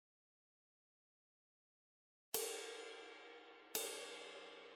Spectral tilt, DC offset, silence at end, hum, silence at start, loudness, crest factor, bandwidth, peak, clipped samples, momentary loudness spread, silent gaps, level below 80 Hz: 0.5 dB/octave; under 0.1%; 0 s; none; 2.35 s; -47 LUFS; 30 dB; 16 kHz; -24 dBFS; under 0.1%; 14 LU; none; under -90 dBFS